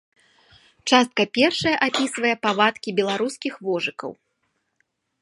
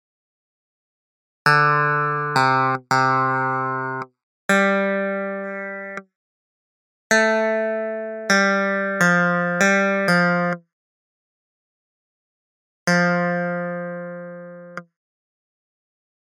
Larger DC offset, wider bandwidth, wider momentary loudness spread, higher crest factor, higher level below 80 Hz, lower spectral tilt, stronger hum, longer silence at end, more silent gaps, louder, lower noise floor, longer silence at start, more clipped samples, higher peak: neither; second, 11.5 kHz vs 16 kHz; second, 10 LU vs 16 LU; about the same, 24 dB vs 22 dB; first, -64 dBFS vs -76 dBFS; second, -3.5 dB/octave vs -5 dB/octave; neither; second, 1.1 s vs 1.55 s; second, none vs 4.23-4.49 s, 6.15-7.10 s, 10.73-12.87 s; about the same, -21 LUFS vs -19 LUFS; second, -73 dBFS vs under -90 dBFS; second, 0.85 s vs 1.45 s; neither; about the same, 0 dBFS vs -2 dBFS